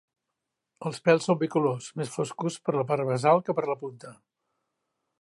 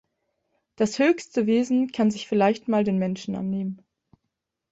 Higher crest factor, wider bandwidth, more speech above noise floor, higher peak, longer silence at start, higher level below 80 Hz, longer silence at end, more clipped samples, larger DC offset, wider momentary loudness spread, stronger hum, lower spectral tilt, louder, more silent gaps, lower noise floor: about the same, 20 dB vs 16 dB; first, 11.5 kHz vs 8 kHz; about the same, 58 dB vs 58 dB; about the same, -8 dBFS vs -8 dBFS; about the same, 0.8 s vs 0.8 s; second, -76 dBFS vs -66 dBFS; first, 1.1 s vs 0.95 s; neither; neither; first, 13 LU vs 8 LU; neither; about the same, -6 dB/octave vs -6 dB/octave; second, -27 LUFS vs -24 LUFS; neither; about the same, -84 dBFS vs -81 dBFS